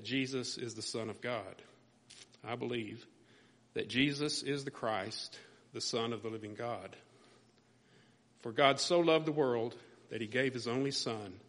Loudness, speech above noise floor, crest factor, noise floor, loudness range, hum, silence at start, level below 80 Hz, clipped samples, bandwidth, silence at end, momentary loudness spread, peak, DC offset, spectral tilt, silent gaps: -35 LUFS; 32 dB; 26 dB; -67 dBFS; 9 LU; none; 0 s; -76 dBFS; under 0.1%; 10.5 kHz; 0.05 s; 19 LU; -12 dBFS; under 0.1%; -4 dB/octave; none